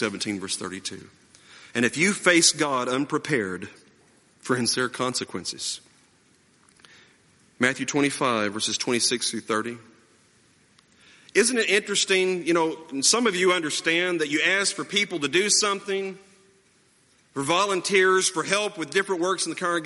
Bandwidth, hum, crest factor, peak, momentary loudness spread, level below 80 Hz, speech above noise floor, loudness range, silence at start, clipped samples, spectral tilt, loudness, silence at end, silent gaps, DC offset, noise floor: 11.5 kHz; none; 22 dB; -4 dBFS; 12 LU; -70 dBFS; 37 dB; 7 LU; 0 s; under 0.1%; -2 dB/octave; -23 LUFS; 0 s; none; under 0.1%; -61 dBFS